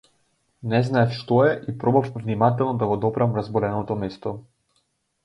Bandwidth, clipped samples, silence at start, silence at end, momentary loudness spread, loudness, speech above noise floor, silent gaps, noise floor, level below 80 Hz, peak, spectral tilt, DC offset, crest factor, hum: 8.2 kHz; under 0.1%; 0.65 s; 0.85 s; 11 LU; -23 LUFS; 48 dB; none; -70 dBFS; -56 dBFS; -4 dBFS; -8.5 dB/octave; under 0.1%; 20 dB; none